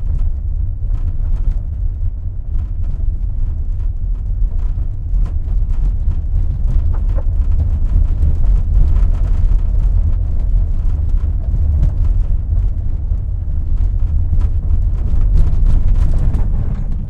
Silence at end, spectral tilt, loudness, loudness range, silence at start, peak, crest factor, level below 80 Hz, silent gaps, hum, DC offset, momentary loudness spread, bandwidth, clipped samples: 0 s; -10 dB/octave; -19 LUFS; 5 LU; 0 s; -2 dBFS; 12 dB; -14 dBFS; none; none; under 0.1%; 6 LU; 1.9 kHz; under 0.1%